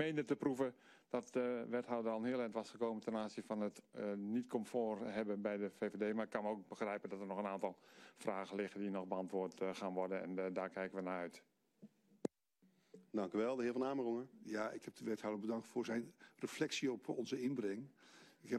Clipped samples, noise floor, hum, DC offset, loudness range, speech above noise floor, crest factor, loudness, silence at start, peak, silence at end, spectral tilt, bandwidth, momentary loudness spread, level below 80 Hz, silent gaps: under 0.1%; -77 dBFS; none; under 0.1%; 2 LU; 34 dB; 20 dB; -43 LUFS; 0 s; -22 dBFS; 0 s; -5.5 dB/octave; 13 kHz; 8 LU; -86 dBFS; none